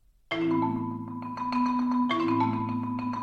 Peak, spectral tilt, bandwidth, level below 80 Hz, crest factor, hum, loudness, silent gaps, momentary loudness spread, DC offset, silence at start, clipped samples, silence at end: -14 dBFS; -7.5 dB/octave; 7 kHz; -62 dBFS; 14 dB; none; -28 LUFS; none; 9 LU; under 0.1%; 0.3 s; under 0.1%; 0 s